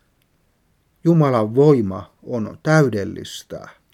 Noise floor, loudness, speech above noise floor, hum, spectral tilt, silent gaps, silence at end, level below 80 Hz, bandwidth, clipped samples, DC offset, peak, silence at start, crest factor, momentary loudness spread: -63 dBFS; -18 LUFS; 45 dB; none; -7.5 dB/octave; none; 0.25 s; -60 dBFS; 13.5 kHz; under 0.1%; under 0.1%; -2 dBFS; 1.05 s; 18 dB; 18 LU